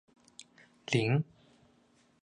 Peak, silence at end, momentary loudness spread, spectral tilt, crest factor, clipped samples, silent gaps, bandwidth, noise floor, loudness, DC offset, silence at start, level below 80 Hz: -14 dBFS; 1 s; 25 LU; -6 dB/octave; 22 dB; under 0.1%; none; 10.5 kHz; -67 dBFS; -32 LUFS; under 0.1%; 0.9 s; -74 dBFS